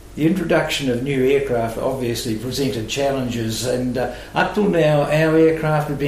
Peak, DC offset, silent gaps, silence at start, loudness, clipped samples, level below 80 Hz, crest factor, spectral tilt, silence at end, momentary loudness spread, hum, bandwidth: -6 dBFS; under 0.1%; none; 0 s; -19 LUFS; under 0.1%; -42 dBFS; 14 dB; -5.5 dB/octave; 0 s; 7 LU; none; 15.5 kHz